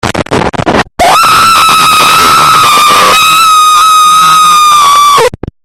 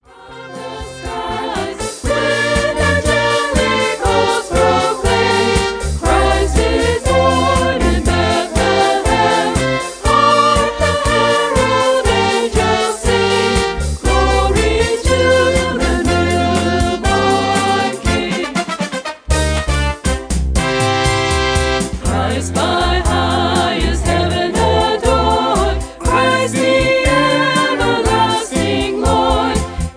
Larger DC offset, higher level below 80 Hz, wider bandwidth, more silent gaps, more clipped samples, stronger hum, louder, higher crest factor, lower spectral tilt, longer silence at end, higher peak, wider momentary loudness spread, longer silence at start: first, 0.8% vs under 0.1%; second, -34 dBFS vs -24 dBFS; first, over 20 kHz vs 10.5 kHz; neither; first, 2% vs under 0.1%; neither; first, -3 LUFS vs -14 LUFS; second, 4 dB vs 14 dB; second, -1.5 dB/octave vs -4.5 dB/octave; first, 0.35 s vs 0.05 s; about the same, 0 dBFS vs 0 dBFS; about the same, 7 LU vs 6 LU; second, 0.05 s vs 0.2 s